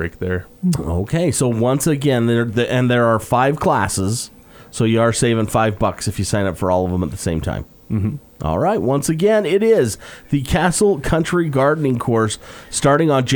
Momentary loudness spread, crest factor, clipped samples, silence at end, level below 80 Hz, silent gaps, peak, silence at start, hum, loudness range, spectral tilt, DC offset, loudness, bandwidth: 8 LU; 16 dB; under 0.1%; 0 s; -38 dBFS; none; -2 dBFS; 0 s; none; 3 LU; -5.5 dB/octave; under 0.1%; -18 LUFS; over 20 kHz